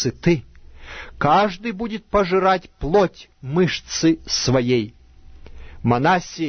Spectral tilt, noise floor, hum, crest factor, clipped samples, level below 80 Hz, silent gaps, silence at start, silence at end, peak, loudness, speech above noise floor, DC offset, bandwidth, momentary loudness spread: -5 dB/octave; -43 dBFS; none; 16 dB; under 0.1%; -40 dBFS; none; 0 s; 0 s; -4 dBFS; -20 LUFS; 23 dB; under 0.1%; 6.6 kHz; 11 LU